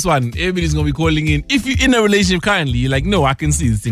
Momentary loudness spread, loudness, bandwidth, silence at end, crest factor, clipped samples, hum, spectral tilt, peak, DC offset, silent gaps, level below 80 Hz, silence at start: 4 LU; -15 LUFS; 15 kHz; 0 s; 12 dB; under 0.1%; none; -5 dB/octave; -2 dBFS; under 0.1%; none; -26 dBFS; 0 s